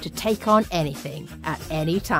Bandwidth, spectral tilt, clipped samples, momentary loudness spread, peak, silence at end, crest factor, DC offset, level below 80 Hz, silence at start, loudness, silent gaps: 16 kHz; -5.5 dB/octave; under 0.1%; 13 LU; -6 dBFS; 0 s; 18 dB; under 0.1%; -44 dBFS; 0 s; -24 LUFS; none